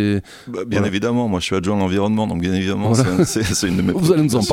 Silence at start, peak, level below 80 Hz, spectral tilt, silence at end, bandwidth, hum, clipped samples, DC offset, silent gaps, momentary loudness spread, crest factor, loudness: 0 s; -2 dBFS; -42 dBFS; -5.5 dB/octave; 0 s; 16.5 kHz; none; under 0.1%; under 0.1%; none; 5 LU; 16 dB; -18 LUFS